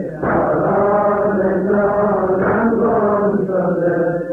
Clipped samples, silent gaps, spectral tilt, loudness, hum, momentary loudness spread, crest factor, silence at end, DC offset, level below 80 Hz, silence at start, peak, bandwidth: under 0.1%; none; -11 dB/octave; -16 LUFS; none; 3 LU; 10 dB; 0 s; under 0.1%; -44 dBFS; 0 s; -6 dBFS; 3.3 kHz